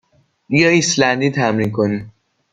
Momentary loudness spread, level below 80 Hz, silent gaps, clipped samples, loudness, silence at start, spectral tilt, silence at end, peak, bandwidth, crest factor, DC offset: 7 LU; -54 dBFS; none; under 0.1%; -16 LUFS; 0.5 s; -4.5 dB/octave; 0.45 s; -2 dBFS; 9.6 kHz; 16 dB; under 0.1%